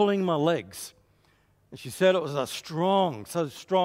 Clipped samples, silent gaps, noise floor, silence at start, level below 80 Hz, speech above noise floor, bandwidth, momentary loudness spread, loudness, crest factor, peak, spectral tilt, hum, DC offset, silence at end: under 0.1%; none; -64 dBFS; 0 s; -70 dBFS; 38 dB; 16 kHz; 17 LU; -26 LUFS; 18 dB; -10 dBFS; -5.5 dB/octave; 50 Hz at -60 dBFS; under 0.1%; 0 s